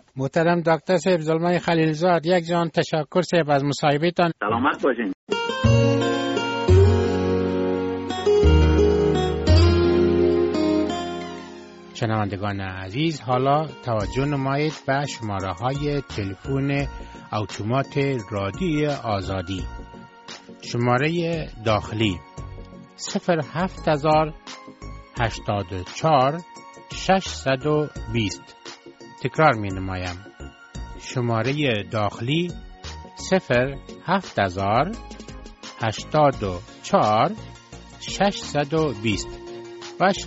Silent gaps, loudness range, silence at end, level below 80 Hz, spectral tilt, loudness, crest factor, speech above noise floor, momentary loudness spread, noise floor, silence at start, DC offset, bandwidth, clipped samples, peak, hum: 5.14-5.27 s; 7 LU; 0 s; -36 dBFS; -5.5 dB/octave; -22 LUFS; 20 dB; 21 dB; 19 LU; -43 dBFS; 0.15 s; under 0.1%; 8 kHz; under 0.1%; -2 dBFS; none